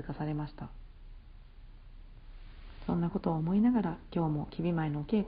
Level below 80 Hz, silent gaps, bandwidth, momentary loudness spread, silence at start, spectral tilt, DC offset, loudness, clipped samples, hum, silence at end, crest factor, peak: -50 dBFS; none; 5 kHz; 20 LU; 0 s; -8.5 dB/octave; under 0.1%; -33 LUFS; under 0.1%; none; 0 s; 16 dB; -18 dBFS